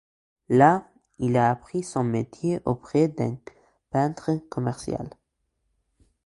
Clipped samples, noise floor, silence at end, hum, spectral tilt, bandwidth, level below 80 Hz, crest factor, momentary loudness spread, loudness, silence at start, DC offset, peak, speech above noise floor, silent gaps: under 0.1%; -76 dBFS; 1.15 s; none; -7.5 dB/octave; 11.5 kHz; -56 dBFS; 22 dB; 12 LU; -25 LUFS; 0.5 s; under 0.1%; -4 dBFS; 52 dB; none